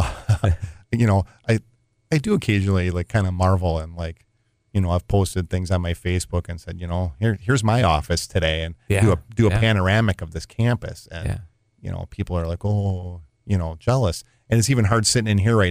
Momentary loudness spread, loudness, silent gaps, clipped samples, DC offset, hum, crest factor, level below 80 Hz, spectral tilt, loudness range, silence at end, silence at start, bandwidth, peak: 13 LU; -22 LUFS; none; under 0.1%; under 0.1%; none; 18 dB; -36 dBFS; -5.5 dB/octave; 5 LU; 0 s; 0 s; 15.5 kHz; -4 dBFS